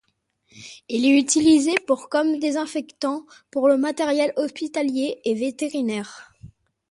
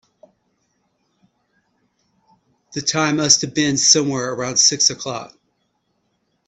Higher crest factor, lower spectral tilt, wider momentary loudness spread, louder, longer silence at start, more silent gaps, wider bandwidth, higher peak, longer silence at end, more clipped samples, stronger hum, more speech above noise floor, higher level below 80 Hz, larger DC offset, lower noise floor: second, 16 dB vs 22 dB; about the same, -3 dB/octave vs -2 dB/octave; about the same, 13 LU vs 15 LU; second, -22 LUFS vs -16 LUFS; second, 0.55 s vs 2.7 s; neither; first, 11.5 kHz vs 8.8 kHz; second, -6 dBFS vs 0 dBFS; second, 0.45 s vs 1.2 s; neither; neither; second, 46 dB vs 51 dB; about the same, -62 dBFS vs -62 dBFS; neither; about the same, -68 dBFS vs -69 dBFS